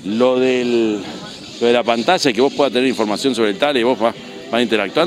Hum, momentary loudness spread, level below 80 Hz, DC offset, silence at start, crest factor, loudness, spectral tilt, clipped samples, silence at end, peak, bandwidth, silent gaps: none; 8 LU; -60 dBFS; under 0.1%; 0 s; 16 dB; -16 LUFS; -4 dB/octave; under 0.1%; 0 s; 0 dBFS; 14 kHz; none